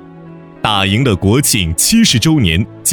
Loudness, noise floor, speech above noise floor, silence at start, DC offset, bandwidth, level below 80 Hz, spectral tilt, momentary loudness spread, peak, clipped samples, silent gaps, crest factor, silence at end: -12 LUFS; -34 dBFS; 22 dB; 0 s; under 0.1%; 19 kHz; -32 dBFS; -4 dB/octave; 5 LU; 0 dBFS; under 0.1%; none; 12 dB; 0 s